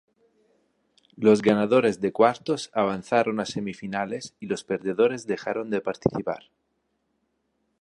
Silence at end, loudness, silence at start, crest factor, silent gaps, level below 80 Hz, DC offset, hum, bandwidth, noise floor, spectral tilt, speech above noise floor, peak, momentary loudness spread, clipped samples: 1.4 s; -25 LUFS; 1.2 s; 22 dB; none; -62 dBFS; under 0.1%; none; 11 kHz; -74 dBFS; -6 dB/octave; 50 dB; -4 dBFS; 12 LU; under 0.1%